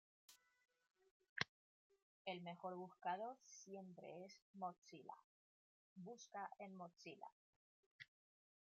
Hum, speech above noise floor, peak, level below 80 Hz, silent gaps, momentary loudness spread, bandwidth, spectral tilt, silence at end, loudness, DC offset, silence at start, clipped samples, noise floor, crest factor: none; over 36 dB; -22 dBFS; under -90 dBFS; 1.11-1.20 s, 1.29-1.36 s, 1.49-1.90 s, 2.02-2.25 s, 4.42-4.54 s, 4.78-4.82 s, 5.24-5.96 s, 7.32-7.99 s; 15 LU; 7.4 kHz; -2.5 dB/octave; 0.6 s; -54 LUFS; under 0.1%; 0.3 s; under 0.1%; under -90 dBFS; 34 dB